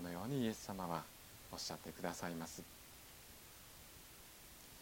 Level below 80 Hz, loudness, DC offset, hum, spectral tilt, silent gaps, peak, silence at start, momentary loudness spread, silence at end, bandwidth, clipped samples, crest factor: -68 dBFS; -48 LUFS; under 0.1%; none; -4.5 dB/octave; none; -26 dBFS; 0 s; 15 LU; 0 s; 17 kHz; under 0.1%; 22 dB